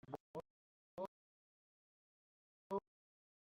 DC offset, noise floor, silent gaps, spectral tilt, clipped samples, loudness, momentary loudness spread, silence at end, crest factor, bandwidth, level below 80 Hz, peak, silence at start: under 0.1%; under -90 dBFS; 0.20-0.34 s, 0.50-0.97 s, 1.08-2.70 s; -7 dB/octave; under 0.1%; -51 LUFS; 8 LU; 0.7 s; 24 dB; 7.2 kHz; -84 dBFS; -30 dBFS; 0.1 s